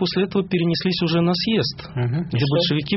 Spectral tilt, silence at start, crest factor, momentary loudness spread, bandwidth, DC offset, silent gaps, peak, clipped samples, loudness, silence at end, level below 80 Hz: -5 dB/octave; 0 s; 14 dB; 5 LU; 6 kHz; under 0.1%; none; -8 dBFS; under 0.1%; -21 LUFS; 0 s; -50 dBFS